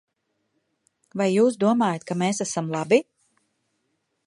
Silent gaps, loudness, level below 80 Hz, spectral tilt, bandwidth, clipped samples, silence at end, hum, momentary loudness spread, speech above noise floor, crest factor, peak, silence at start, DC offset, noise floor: none; -23 LUFS; -72 dBFS; -5.5 dB/octave; 11.5 kHz; under 0.1%; 1.25 s; none; 7 LU; 53 dB; 20 dB; -4 dBFS; 1.15 s; under 0.1%; -75 dBFS